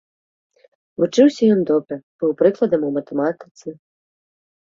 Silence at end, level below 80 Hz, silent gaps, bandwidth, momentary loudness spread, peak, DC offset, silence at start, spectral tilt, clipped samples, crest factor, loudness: 0.95 s; -66 dBFS; 2.03-2.19 s, 3.51-3.55 s; 7.6 kHz; 21 LU; -2 dBFS; under 0.1%; 1 s; -6.5 dB/octave; under 0.1%; 18 dB; -18 LUFS